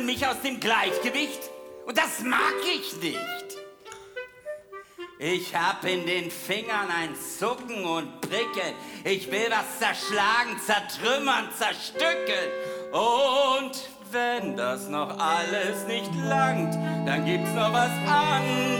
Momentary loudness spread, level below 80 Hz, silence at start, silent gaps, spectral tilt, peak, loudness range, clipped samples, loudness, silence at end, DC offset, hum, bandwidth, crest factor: 14 LU; -70 dBFS; 0 s; none; -3.5 dB/octave; -6 dBFS; 5 LU; under 0.1%; -26 LUFS; 0 s; under 0.1%; none; over 20 kHz; 20 dB